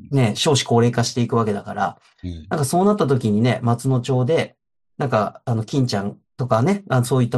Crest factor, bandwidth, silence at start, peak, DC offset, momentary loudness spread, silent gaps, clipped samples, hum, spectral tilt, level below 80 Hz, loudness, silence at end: 16 dB; 12.5 kHz; 0 s; -2 dBFS; under 0.1%; 10 LU; none; under 0.1%; none; -6 dB/octave; -54 dBFS; -20 LUFS; 0 s